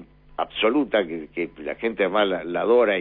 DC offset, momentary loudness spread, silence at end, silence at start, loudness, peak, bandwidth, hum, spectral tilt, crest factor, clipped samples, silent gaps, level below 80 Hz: under 0.1%; 11 LU; 0 s; 0 s; -23 LUFS; -8 dBFS; 4.2 kHz; none; -8.5 dB/octave; 14 dB; under 0.1%; none; -56 dBFS